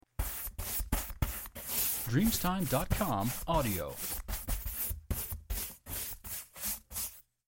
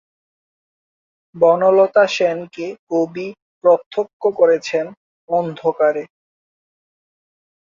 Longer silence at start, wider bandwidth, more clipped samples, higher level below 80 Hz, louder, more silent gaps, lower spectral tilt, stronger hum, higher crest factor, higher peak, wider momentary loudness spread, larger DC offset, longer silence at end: second, 0.2 s vs 1.35 s; first, 17 kHz vs 7.4 kHz; neither; first, -42 dBFS vs -68 dBFS; second, -35 LUFS vs -17 LUFS; second, none vs 2.79-2.87 s, 3.42-3.61 s, 3.86-3.91 s, 4.13-4.20 s, 4.97-5.28 s; second, -4 dB/octave vs -5.5 dB/octave; neither; about the same, 18 dB vs 18 dB; second, -16 dBFS vs -2 dBFS; second, 9 LU vs 15 LU; neither; second, 0.25 s vs 1.7 s